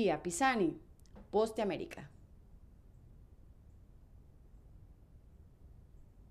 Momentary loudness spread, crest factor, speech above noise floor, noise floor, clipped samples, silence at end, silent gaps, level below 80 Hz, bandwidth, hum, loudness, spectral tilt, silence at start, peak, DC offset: 25 LU; 22 dB; 25 dB; -59 dBFS; under 0.1%; 0.1 s; none; -60 dBFS; 14.5 kHz; none; -35 LUFS; -4.5 dB/octave; 0 s; -18 dBFS; under 0.1%